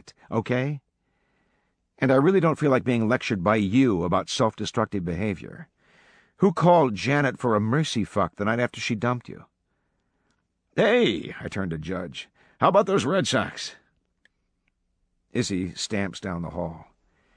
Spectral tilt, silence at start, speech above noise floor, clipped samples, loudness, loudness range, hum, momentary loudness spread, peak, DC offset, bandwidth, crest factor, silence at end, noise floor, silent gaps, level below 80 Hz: -6 dB/octave; 0.3 s; 50 dB; under 0.1%; -24 LUFS; 6 LU; none; 12 LU; -4 dBFS; under 0.1%; 10.5 kHz; 22 dB; 0.55 s; -73 dBFS; none; -56 dBFS